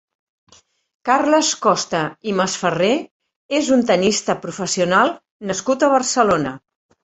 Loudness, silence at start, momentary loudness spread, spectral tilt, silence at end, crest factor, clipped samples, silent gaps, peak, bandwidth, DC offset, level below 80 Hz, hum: -18 LUFS; 1.05 s; 8 LU; -3.5 dB/octave; 0.45 s; 18 dB; under 0.1%; 3.11-3.20 s, 3.36-3.49 s, 5.31-5.40 s; -2 dBFS; 8.4 kHz; under 0.1%; -58 dBFS; none